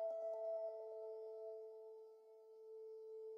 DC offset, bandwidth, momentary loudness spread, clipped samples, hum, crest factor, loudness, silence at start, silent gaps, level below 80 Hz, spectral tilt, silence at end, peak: under 0.1%; 6.2 kHz; 16 LU; under 0.1%; none; 12 dB; -50 LUFS; 0 s; none; under -90 dBFS; -1 dB/octave; 0 s; -38 dBFS